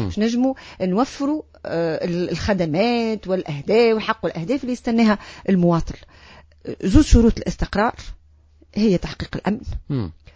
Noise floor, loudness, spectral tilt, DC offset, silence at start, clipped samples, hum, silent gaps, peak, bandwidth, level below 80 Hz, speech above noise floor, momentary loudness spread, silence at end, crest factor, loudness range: -52 dBFS; -21 LUFS; -6.5 dB/octave; under 0.1%; 0 s; under 0.1%; none; none; 0 dBFS; 8 kHz; -30 dBFS; 32 dB; 11 LU; 0.25 s; 20 dB; 2 LU